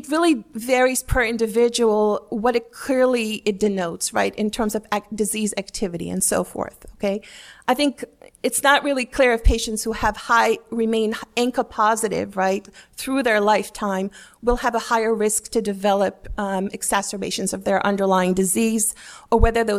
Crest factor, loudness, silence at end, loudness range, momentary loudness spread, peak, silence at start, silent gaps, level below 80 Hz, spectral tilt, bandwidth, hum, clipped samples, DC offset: 20 dB; -21 LUFS; 0 s; 4 LU; 9 LU; -2 dBFS; 0 s; none; -34 dBFS; -4 dB/octave; 16.5 kHz; none; under 0.1%; under 0.1%